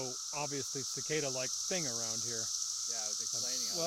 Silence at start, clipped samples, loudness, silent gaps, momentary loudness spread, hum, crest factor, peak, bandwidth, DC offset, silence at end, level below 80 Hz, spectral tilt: 0 s; under 0.1%; -34 LUFS; none; 3 LU; none; 16 dB; -20 dBFS; 16.5 kHz; under 0.1%; 0 s; -78 dBFS; -1 dB/octave